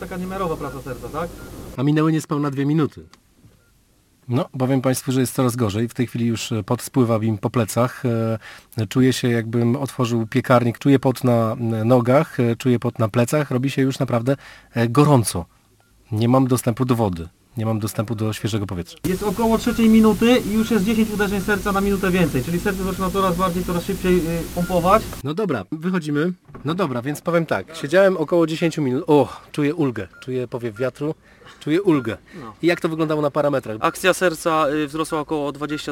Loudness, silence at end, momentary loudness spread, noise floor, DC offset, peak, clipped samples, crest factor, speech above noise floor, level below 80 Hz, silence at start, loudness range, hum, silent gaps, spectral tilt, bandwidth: -20 LUFS; 0 s; 10 LU; -58 dBFS; under 0.1%; -2 dBFS; under 0.1%; 18 dB; 38 dB; -44 dBFS; 0 s; 5 LU; none; none; -6.5 dB/octave; 17 kHz